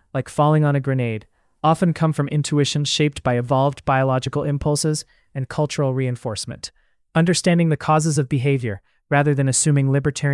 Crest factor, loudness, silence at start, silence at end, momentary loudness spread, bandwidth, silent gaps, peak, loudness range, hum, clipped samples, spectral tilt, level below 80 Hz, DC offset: 16 dB; -20 LUFS; 0.15 s; 0 s; 10 LU; 12 kHz; none; -4 dBFS; 3 LU; none; under 0.1%; -5.5 dB/octave; -50 dBFS; under 0.1%